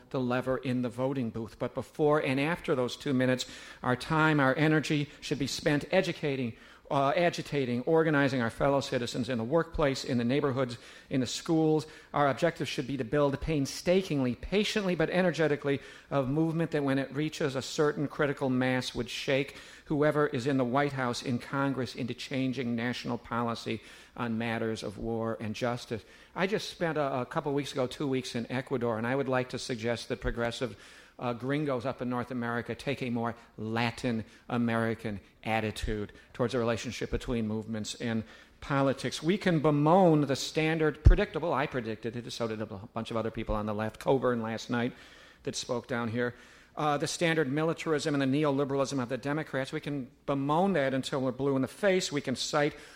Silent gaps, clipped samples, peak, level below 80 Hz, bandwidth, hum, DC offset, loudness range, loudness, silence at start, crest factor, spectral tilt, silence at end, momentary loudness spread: none; under 0.1%; -6 dBFS; -44 dBFS; 16 kHz; none; under 0.1%; 5 LU; -31 LUFS; 0.1 s; 24 dB; -5.5 dB/octave; 0 s; 9 LU